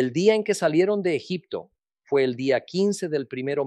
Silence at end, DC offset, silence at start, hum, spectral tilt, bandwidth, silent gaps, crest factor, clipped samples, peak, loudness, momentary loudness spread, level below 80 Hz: 0 s; under 0.1%; 0 s; none; -5.5 dB/octave; 12.5 kHz; none; 18 dB; under 0.1%; -6 dBFS; -24 LUFS; 10 LU; -74 dBFS